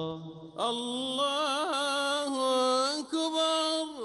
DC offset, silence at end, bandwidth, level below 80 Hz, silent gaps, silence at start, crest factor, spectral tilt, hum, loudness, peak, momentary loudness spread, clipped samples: under 0.1%; 0 s; 11.5 kHz; -74 dBFS; none; 0 s; 14 dB; -2.5 dB/octave; none; -29 LUFS; -16 dBFS; 6 LU; under 0.1%